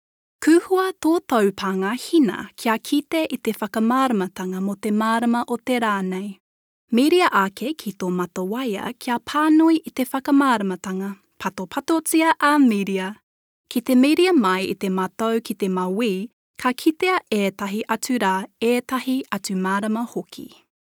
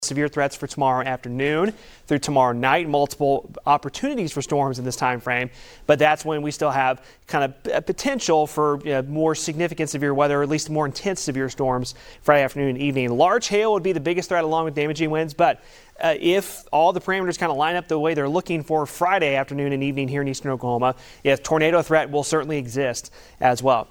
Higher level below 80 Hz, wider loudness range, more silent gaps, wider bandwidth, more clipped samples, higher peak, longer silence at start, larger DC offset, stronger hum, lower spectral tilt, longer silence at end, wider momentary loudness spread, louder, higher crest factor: second, -68 dBFS vs -52 dBFS; about the same, 3 LU vs 2 LU; first, 6.40-6.88 s, 13.23-13.64 s, 16.33-16.54 s vs none; first, over 20 kHz vs 18 kHz; neither; about the same, -4 dBFS vs -2 dBFS; first, 0.4 s vs 0 s; neither; neither; about the same, -5 dB/octave vs -5 dB/octave; first, 0.35 s vs 0.05 s; first, 11 LU vs 7 LU; about the same, -21 LUFS vs -22 LUFS; about the same, 18 dB vs 20 dB